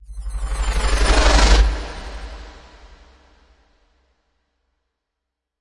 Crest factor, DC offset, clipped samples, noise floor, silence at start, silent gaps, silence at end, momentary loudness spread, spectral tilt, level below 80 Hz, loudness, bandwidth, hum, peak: 18 dB; under 0.1%; under 0.1%; -81 dBFS; 0.1 s; none; 3 s; 22 LU; -4 dB/octave; -22 dBFS; -18 LUFS; 11.5 kHz; none; -2 dBFS